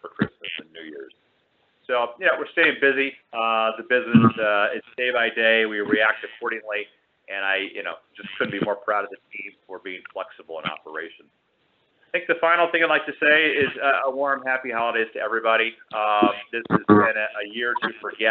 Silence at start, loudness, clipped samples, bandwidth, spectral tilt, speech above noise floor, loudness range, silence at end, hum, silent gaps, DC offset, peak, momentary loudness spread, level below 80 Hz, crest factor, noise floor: 0.05 s; -22 LUFS; under 0.1%; 4.6 kHz; -2.5 dB/octave; 44 dB; 9 LU; 0 s; none; none; under 0.1%; -2 dBFS; 17 LU; -68 dBFS; 22 dB; -67 dBFS